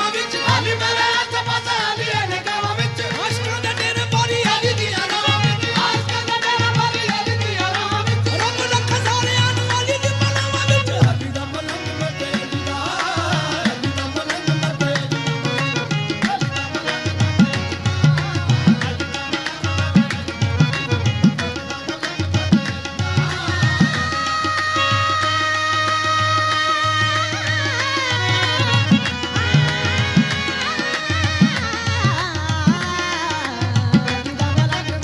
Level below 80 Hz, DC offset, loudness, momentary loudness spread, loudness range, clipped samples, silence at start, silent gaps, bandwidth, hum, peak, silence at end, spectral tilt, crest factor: -44 dBFS; under 0.1%; -19 LUFS; 6 LU; 3 LU; under 0.1%; 0 s; none; 12 kHz; none; 0 dBFS; 0 s; -4.5 dB/octave; 18 dB